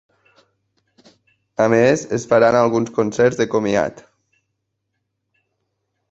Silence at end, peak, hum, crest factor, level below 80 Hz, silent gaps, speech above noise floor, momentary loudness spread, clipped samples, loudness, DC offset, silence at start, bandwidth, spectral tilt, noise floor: 2.1 s; -2 dBFS; none; 18 dB; -56 dBFS; none; 59 dB; 7 LU; under 0.1%; -17 LUFS; under 0.1%; 1.6 s; 8 kHz; -5.5 dB/octave; -75 dBFS